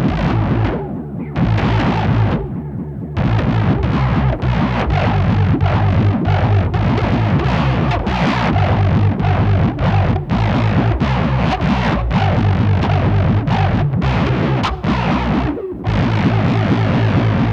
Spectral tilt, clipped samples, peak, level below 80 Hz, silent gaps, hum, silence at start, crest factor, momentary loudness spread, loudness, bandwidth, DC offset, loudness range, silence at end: -8.5 dB/octave; under 0.1%; -2 dBFS; -26 dBFS; none; none; 0 s; 12 dB; 3 LU; -16 LUFS; 7 kHz; under 0.1%; 2 LU; 0 s